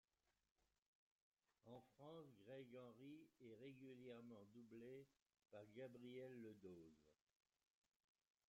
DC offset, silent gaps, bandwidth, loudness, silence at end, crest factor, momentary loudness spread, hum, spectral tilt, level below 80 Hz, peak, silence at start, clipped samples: under 0.1%; 5.22-5.26 s; 7.6 kHz; -62 LUFS; 1.35 s; 16 dB; 7 LU; none; -6 dB/octave; under -90 dBFS; -48 dBFS; 1.65 s; under 0.1%